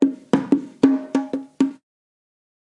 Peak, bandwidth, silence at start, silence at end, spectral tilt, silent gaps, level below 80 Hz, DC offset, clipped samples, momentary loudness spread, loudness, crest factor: 0 dBFS; 8.6 kHz; 0 s; 1 s; -7 dB/octave; none; -68 dBFS; under 0.1%; under 0.1%; 6 LU; -21 LUFS; 22 dB